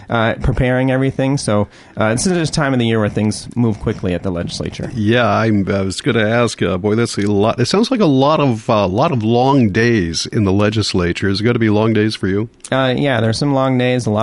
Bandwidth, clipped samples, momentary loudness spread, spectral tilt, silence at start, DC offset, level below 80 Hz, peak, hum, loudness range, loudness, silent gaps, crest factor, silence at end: 11.5 kHz; under 0.1%; 6 LU; -6 dB/octave; 0 s; under 0.1%; -36 dBFS; -2 dBFS; none; 3 LU; -16 LUFS; none; 14 dB; 0 s